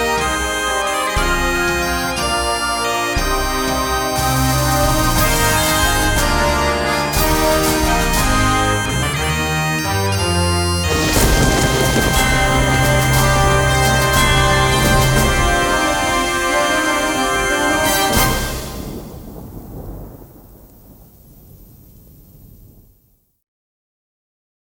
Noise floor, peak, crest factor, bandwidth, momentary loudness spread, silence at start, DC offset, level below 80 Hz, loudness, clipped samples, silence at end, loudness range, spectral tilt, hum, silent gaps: -58 dBFS; 0 dBFS; 16 dB; 18 kHz; 5 LU; 0 s; under 0.1%; -24 dBFS; -15 LUFS; under 0.1%; 3.75 s; 5 LU; -3.5 dB/octave; none; none